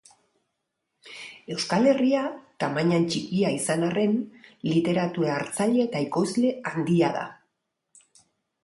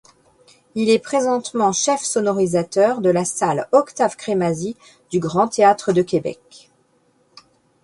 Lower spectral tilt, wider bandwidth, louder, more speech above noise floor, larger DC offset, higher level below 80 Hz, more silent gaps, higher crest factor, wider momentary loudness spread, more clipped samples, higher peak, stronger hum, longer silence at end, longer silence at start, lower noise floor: about the same, -5.5 dB/octave vs -4.5 dB/octave; about the same, 11.5 kHz vs 11.5 kHz; second, -25 LUFS vs -19 LUFS; first, 56 dB vs 42 dB; neither; second, -68 dBFS vs -60 dBFS; neither; about the same, 16 dB vs 18 dB; first, 12 LU vs 9 LU; neither; second, -10 dBFS vs -2 dBFS; neither; second, 1.3 s vs 1.5 s; first, 1.05 s vs 0.75 s; first, -80 dBFS vs -61 dBFS